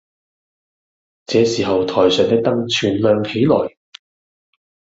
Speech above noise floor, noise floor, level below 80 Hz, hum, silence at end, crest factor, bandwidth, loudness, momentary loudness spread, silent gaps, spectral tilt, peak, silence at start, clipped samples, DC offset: over 75 dB; under -90 dBFS; -58 dBFS; none; 1.3 s; 18 dB; 7.8 kHz; -16 LUFS; 4 LU; none; -5.5 dB/octave; 0 dBFS; 1.3 s; under 0.1%; under 0.1%